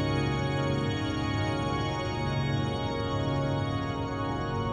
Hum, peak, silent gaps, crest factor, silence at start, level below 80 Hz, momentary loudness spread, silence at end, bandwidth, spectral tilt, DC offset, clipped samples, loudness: none; -16 dBFS; none; 14 dB; 0 s; -44 dBFS; 3 LU; 0 s; 9.4 kHz; -6.5 dB/octave; under 0.1%; under 0.1%; -30 LUFS